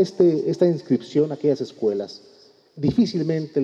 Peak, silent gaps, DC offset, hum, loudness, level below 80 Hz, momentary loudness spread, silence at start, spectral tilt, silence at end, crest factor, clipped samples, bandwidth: -6 dBFS; none; under 0.1%; none; -22 LUFS; -58 dBFS; 7 LU; 0 s; -8 dB/octave; 0 s; 16 dB; under 0.1%; 8 kHz